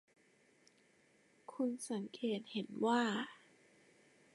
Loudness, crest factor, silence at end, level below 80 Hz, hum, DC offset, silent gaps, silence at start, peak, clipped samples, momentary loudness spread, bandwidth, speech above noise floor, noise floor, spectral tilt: -39 LUFS; 22 dB; 1 s; under -90 dBFS; none; under 0.1%; none; 1.5 s; -22 dBFS; under 0.1%; 14 LU; 11.5 kHz; 33 dB; -71 dBFS; -4.5 dB/octave